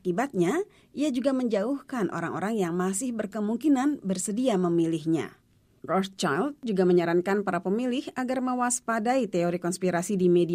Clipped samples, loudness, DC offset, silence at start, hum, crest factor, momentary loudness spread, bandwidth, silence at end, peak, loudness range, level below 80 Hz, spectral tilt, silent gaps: under 0.1%; -27 LUFS; under 0.1%; 0.05 s; none; 14 dB; 7 LU; 15.5 kHz; 0 s; -12 dBFS; 2 LU; -68 dBFS; -5.5 dB/octave; none